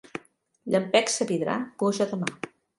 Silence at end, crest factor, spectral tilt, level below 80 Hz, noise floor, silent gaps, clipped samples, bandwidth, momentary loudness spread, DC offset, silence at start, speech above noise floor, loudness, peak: 0.3 s; 20 dB; -4 dB/octave; -72 dBFS; -56 dBFS; none; under 0.1%; 11.5 kHz; 18 LU; under 0.1%; 0.15 s; 31 dB; -26 LUFS; -6 dBFS